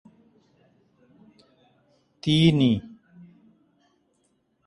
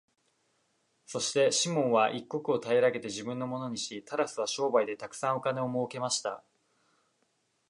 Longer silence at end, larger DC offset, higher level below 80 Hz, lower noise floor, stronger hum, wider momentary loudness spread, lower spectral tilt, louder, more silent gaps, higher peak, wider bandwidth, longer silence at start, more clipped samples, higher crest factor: first, 1.8 s vs 1.3 s; neither; first, -58 dBFS vs -78 dBFS; second, -70 dBFS vs -75 dBFS; neither; first, 15 LU vs 10 LU; first, -7 dB/octave vs -3.5 dB/octave; first, -22 LUFS vs -30 LUFS; neither; first, -6 dBFS vs -12 dBFS; about the same, 11 kHz vs 11.5 kHz; first, 2.25 s vs 1.1 s; neither; about the same, 22 dB vs 18 dB